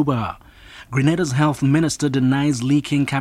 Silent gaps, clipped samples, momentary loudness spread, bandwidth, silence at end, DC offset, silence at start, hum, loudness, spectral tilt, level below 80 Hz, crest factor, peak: none; under 0.1%; 7 LU; 13.5 kHz; 0 s; under 0.1%; 0 s; none; -19 LUFS; -6 dB/octave; -48 dBFS; 16 dB; -2 dBFS